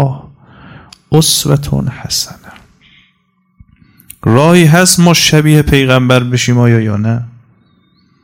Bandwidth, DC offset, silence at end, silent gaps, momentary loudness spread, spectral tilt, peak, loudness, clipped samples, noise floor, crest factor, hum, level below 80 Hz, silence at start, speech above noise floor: 17 kHz; under 0.1%; 0.95 s; none; 11 LU; -4.5 dB/octave; 0 dBFS; -9 LUFS; 1%; -57 dBFS; 12 dB; none; -34 dBFS; 0 s; 49 dB